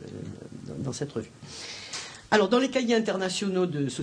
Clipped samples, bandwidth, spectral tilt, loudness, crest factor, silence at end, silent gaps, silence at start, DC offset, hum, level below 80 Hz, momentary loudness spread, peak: under 0.1%; 10.5 kHz; -4.5 dB/octave; -27 LUFS; 22 dB; 0 s; none; 0 s; under 0.1%; none; -64 dBFS; 17 LU; -8 dBFS